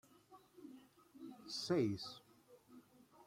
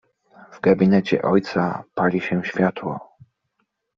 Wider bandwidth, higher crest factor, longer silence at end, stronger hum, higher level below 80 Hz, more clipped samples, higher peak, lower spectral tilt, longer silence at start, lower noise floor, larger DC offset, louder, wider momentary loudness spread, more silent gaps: first, 16 kHz vs 6.8 kHz; about the same, 20 dB vs 18 dB; second, 0.05 s vs 0.95 s; neither; second, -82 dBFS vs -58 dBFS; neither; second, -26 dBFS vs -4 dBFS; about the same, -5.5 dB/octave vs -6.5 dB/octave; second, 0.3 s vs 0.5 s; second, -67 dBFS vs -73 dBFS; neither; second, -42 LUFS vs -21 LUFS; first, 27 LU vs 10 LU; neither